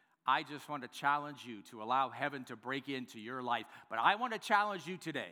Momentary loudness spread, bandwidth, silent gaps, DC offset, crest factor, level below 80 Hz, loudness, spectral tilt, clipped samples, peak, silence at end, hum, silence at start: 13 LU; over 20 kHz; none; under 0.1%; 22 dB; under -90 dBFS; -36 LUFS; -4 dB/octave; under 0.1%; -14 dBFS; 0 s; none; 0.25 s